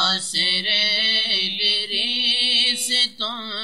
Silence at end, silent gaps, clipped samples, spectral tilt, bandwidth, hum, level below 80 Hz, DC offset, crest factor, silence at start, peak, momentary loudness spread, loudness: 0 s; none; under 0.1%; 0 dB/octave; 16 kHz; none; -72 dBFS; 0.3%; 16 dB; 0 s; -6 dBFS; 4 LU; -18 LUFS